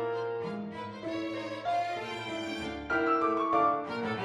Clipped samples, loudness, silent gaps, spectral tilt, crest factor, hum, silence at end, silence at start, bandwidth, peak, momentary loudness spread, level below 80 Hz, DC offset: under 0.1%; -32 LUFS; none; -5.5 dB/octave; 16 dB; none; 0 s; 0 s; 11.5 kHz; -16 dBFS; 10 LU; -62 dBFS; under 0.1%